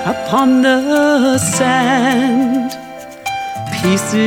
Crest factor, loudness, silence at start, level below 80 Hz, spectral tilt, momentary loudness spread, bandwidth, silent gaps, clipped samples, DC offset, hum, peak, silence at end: 12 dB; -14 LUFS; 0 s; -52 dBFS; -4.5 dB/octave; 11 LU; 17.5 kHz; none; under 0.1%; under 0.1%; none; -2 dBFS; 0 s